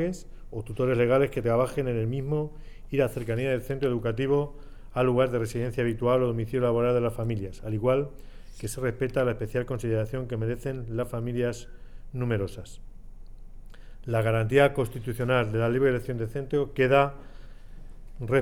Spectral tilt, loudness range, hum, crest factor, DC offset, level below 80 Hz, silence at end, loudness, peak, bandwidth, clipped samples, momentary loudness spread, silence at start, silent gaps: -7 dB/octave; 6 LU; none; 18 dB; 0.4%; -42 dBFS; 0 s; -27 LUFS; -10 dBFS; 16 kHz; under 0.1%; 13 LU; 0 s; none